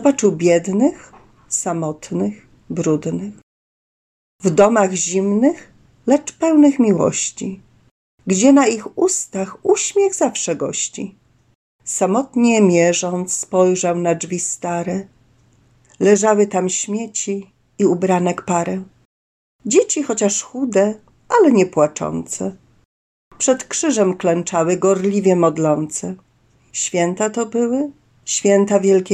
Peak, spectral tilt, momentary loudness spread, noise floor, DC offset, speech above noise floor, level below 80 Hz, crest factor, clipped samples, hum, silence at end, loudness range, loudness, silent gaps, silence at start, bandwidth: -2 dBFS; -4.5 dB/octave; 12 LU; -56 dBFS; under 0.1%; 39 dB; -60 dBFS; 16 dB; under 0.1%; none; 0 s; 4 LU; -17 LUFS; 3.43-4.39 s, 7.91-8.18 s, 11.55-11.79 s, 19.05-19.59 s, 22.85-23.31 s; 0 s; 13 kHz